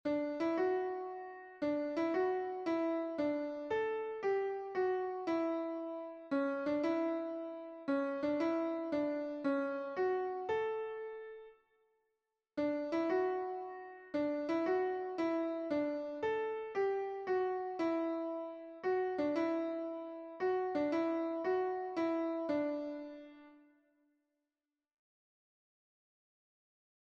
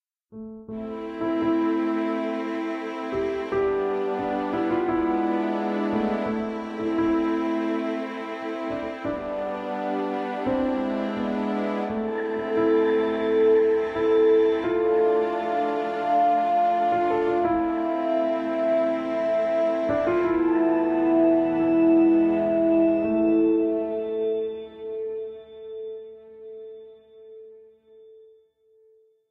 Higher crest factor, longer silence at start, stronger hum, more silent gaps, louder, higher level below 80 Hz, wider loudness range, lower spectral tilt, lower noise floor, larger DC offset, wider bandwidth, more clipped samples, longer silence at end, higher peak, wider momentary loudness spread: about the same, 14 dB vs 14 dB; second, 0.05 s vs 0.3 s; neither; neither; second, -37 LUFS vs -24 LUFS; second, -78 dBFS vs -56 dBFS; second, 3 LU vs 8 LU; about the same, -6.5 dB/octave vs -7.5 dB/octave; first, under -90 dBFS vs -60 dBFS; neither; first, 7.2 kHz vs 6 kHz; neither; first, 3.45 s vs 1.2 s; second, -22 dBFS vs -10 dBFS; about the same, 10 LU vs 12 LU